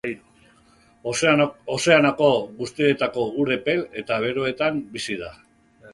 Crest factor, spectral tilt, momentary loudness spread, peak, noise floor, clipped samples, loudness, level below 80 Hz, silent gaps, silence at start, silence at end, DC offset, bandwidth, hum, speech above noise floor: 20 dB; -4.5 dB/octave; 15 LU; -2 dBFS; -56 dBFS; under 0.1%; -22 LUFS; -58 dBFS; none; 0.05 s; 0.05 s; under 0.1%; 11.5 kHz; none; 34 dB